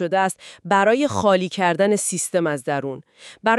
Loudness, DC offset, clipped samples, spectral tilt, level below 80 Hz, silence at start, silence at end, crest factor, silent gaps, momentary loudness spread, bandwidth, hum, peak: -20 LUFS; under 0.1%; under 0.1%; -4 dB/octave; -64 dBFS; 0 s; 0 s; 16 dB; none; 9 LU; 13.5 kHz; none; -4 dBFS